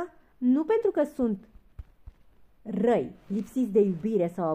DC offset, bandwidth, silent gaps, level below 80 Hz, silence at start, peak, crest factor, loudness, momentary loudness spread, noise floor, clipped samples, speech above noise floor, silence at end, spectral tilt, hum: under 0.1%; 14.5 kHz; none; -56 dBFS; 0 s; -12 dBFS; 16 dB; -27 LUFS; 11 LU; -56 dBFS; under 0.1%; 30 dB; 0 s; -8.5 dB/octave; none